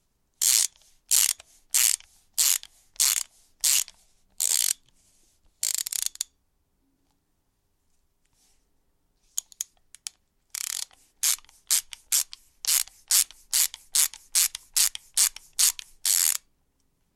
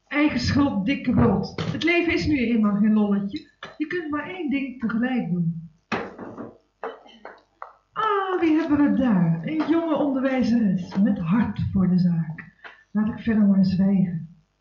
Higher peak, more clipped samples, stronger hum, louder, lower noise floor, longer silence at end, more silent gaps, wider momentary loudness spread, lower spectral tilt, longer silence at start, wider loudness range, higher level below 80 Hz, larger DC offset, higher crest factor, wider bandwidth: first, -2 dBFS vs -8 dBFS; neither; neither; about the same, -24 LUFS vs -23 LUFS; first, -72 dBFS vs -47 dBFS; first, 0.8 s vs 0.3 s; neither; second, 14 LU vs 17 LU; second, 5.5 dB/octave vs -7.5 dB/octave; first, 0.4 s vs 0.1 s; first, 17 LU vs 7 LU; second, -64 dBFS vs -48 dBFS; neither; first, 26 dB vs 14 dB; first, 17 kHz vs 7.2 kHz